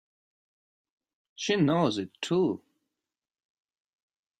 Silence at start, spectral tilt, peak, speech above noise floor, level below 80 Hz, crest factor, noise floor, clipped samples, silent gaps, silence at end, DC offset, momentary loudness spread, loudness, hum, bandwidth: 1.4 s; -5.5 dB/octave; -12 dBFS; 63 dB; -72 dBFS; 20 dB; -89 dBFS; under 0.1%; none; 1.85 s; under 0.1%; 10 LU; -28 LUFS; none; 10 kHz